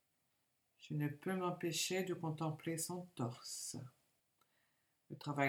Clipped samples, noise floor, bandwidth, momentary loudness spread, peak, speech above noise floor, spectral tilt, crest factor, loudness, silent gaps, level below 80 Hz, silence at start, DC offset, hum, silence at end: under 0.1%; -83 dBFS; 19.5 kHz; 12 LU; -20 dBFS; 41 dB; -4.5 dB/octave; 22 dB; -42 LUFS; none; -86 dBFS; 0.8 s; under 0.1%; none; 0 s